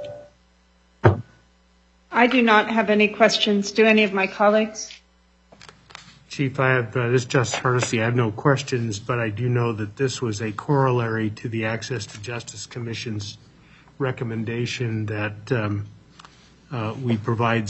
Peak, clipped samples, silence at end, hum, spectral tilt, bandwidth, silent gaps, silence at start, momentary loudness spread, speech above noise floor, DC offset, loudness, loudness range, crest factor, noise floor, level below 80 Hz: 0 dBFS; under 0.1%; 0 s; none; -5.5 dB/octave; 8.4 kHz; none; 0 s; 15 LU; 37 dB; under 0.1%; -22 LUFS; 10 LU; 22 dB; -59 dBFS; -58 dBFS